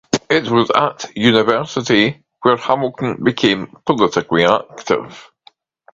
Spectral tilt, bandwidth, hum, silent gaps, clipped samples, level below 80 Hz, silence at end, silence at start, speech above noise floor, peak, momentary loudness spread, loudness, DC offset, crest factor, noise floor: -5 dB/octave; 7.8 kHz; none; none; under 0.1%; -54 dBFS; 0.7 s; 0.15 s; 36 dB; 0 dBFS; 6 LU; -16 LUFS; under 0.1%; 16 dB; -52 dBFS